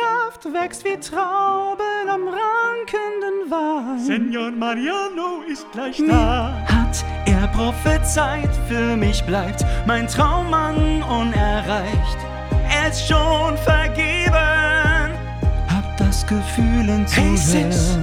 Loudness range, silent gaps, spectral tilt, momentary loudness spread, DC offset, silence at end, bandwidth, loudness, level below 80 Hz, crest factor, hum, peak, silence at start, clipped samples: 4 LU; none; -5 dB/octave; 8 LU; under 0.1%; 0 s; 16 kHz; -19 LUFS; -24 dBFS; 18 dB; none; -2 dBFS; 0 s; under 0.1%